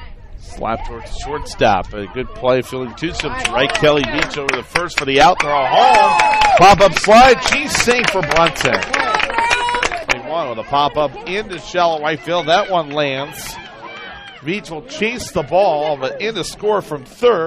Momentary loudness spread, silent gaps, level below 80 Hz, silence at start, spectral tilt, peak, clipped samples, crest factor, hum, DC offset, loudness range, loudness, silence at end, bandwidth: 16 LU; none; -36 dBFS; 0 s; -3.5 dB/octave; 0 dBFS; under 0.1%; 16 dB; none; under 0.1%; 10 LU; -15 LUFS; 0 s; 15.5 kHz